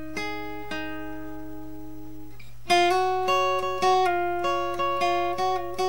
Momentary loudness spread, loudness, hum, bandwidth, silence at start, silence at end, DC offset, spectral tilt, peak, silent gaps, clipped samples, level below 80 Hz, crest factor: 20 LU; -25 LUFS; none; 16.5 kHz; 0 s; 0 s; 2%; -4 dB/octave; -8 dBFS; none; under 0.1%; -52 dBFS; 18 dB